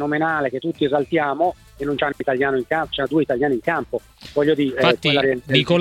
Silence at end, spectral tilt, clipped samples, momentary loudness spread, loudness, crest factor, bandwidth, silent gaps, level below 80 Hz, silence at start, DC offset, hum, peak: 0 s; -6.5 dB/octave; under 0.1%; 7 LU; -20 LUFS; 20 dB; 14.5 kHz; none; -50 dBFS; 0 s; under 0.1%; none; 0 dBFS